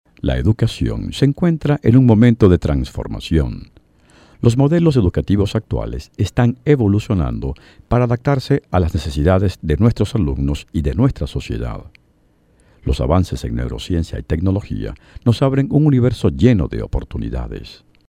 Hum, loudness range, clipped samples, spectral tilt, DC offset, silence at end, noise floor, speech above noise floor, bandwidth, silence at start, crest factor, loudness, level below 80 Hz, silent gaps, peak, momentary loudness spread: none; 6 LU; under 0.1%; -8 dB/octave; under 0.1%; 0.35 s; -56 dBFS; 40 dB; 11 kHz; 0.25 s; 16 dB; -17 LUFS; -28 dBFS; none; 0 dBFS; 12 LU